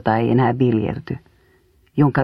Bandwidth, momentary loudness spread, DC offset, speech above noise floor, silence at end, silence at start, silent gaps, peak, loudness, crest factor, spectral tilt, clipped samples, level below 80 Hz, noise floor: 5.4 kHz; 14 LU; under 0.1%; 39 dB; 0 s; 0.05 s; none; -2 dBFS; -19 LUFS; 18 dB; -10 dB/octave; under 0.1%; -50 dBFS; -57 dBFS